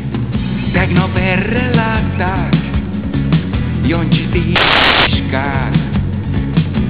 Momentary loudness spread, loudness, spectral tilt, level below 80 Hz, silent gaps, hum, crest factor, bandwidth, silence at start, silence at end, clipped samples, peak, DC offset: 9 LU; -14 LUFS; -10 dB/octave; -24 dBFS; none; none; 14 dB; 4 kHz; 0 s; 0 s; under 0.1%; 0 dBFS; 2%